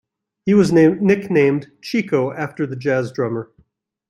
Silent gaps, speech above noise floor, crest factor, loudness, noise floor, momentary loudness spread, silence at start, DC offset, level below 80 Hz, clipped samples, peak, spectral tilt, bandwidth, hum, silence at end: none; 43 dB; 16 dB; -18 LUFS; -60 dBFS; 11 LU; 0.45 s; under 0.1%; -58 dBFS; under 0.1%; -2 dBFS; -7.5 dB/octave; 13 kHz; none; 0.65 s